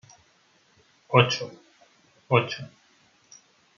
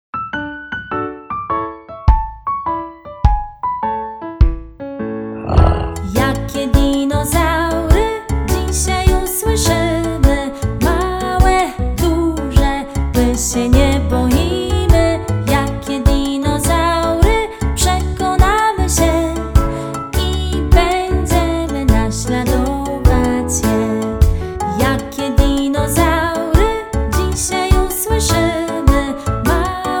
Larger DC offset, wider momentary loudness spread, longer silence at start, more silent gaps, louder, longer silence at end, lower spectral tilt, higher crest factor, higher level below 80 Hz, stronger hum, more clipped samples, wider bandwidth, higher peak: neither; first, 18 LU vs 8 LU; first, 1.1 s vs 0.15 s; neither; second, -24 LUFS vs -16 LUFS; first, 1.1 s vs 0 s; about the same, -5 dB/octave vs -5.5 dB/octave; first, 26 dB vs 14 dB; second, -70 dBFS vs -18 dBFS; neither; second, under 0.1% vs 0.1%; second, 7 kHz vs over 20 kHz; second, -4 dBFS vs 0 dBFS